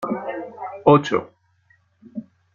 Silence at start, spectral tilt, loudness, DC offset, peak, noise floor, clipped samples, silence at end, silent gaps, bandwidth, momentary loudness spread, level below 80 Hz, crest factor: 0 s; -7.5 dB/octave; -20 LUFS; under 0.1%; -2 dBFS; -61 dBFS; under 0.1%; 0.3 s; none; 7.4 kHz; 21 LU; -60 dBFS; 20 dB